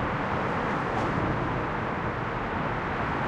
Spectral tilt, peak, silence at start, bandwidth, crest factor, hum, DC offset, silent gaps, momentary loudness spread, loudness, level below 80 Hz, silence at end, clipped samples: -7 dB/octave; -16 dBFS; 0 s; 10 kHz; 14 dB; none; under 0.1%; none; 3 LU; -29 LUFS; -44 dBFS; 0 s; under 0.1%